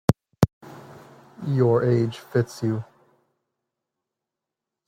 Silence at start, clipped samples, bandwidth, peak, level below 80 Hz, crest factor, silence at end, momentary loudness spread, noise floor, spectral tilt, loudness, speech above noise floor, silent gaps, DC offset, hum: 0.1 s; under 0.1%; 16 kHz; -2 dBFS; -52 dBFS; 24 dB; 2.05 s; 24 LU; -86 dBFS; -8 dB/octave; -24 LUFS; 64 dB; 0.53-0.61 s; under 0.1%; none